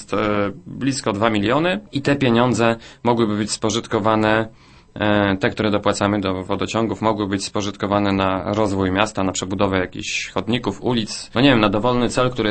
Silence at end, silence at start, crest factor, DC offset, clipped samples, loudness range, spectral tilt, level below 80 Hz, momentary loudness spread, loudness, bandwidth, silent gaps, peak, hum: 0 s; 0 s; 20 dB; under 0.1%; under 0.1%; 2 LU; -5 dB/octave; -44 dBFS; 7 LU; -20 LUFS; 8.8 kHz; none; 0 dBFS; none